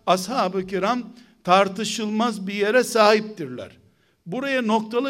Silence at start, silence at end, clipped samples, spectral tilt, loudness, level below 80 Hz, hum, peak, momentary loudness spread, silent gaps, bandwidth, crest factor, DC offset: 0.05 s; 0 s; under 0.1%; -4 dB/octave; -21 LUFS; -66 dBFS; none; -2 dBFS; 16 LU; none; 16 kHz; 20 dB; under 0.1%